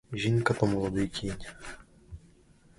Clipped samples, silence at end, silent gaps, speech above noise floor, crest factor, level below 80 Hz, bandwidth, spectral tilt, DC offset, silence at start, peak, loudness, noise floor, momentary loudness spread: under 0.1%; 0.6 s; none; 30 dB; 22 dB; -50 dBFS; 11.5 kHz; -6 dB/octave; under 0.1%; 0.1 s; -10 dBFS; -30 LUFS; -59 dBFS; 24 LU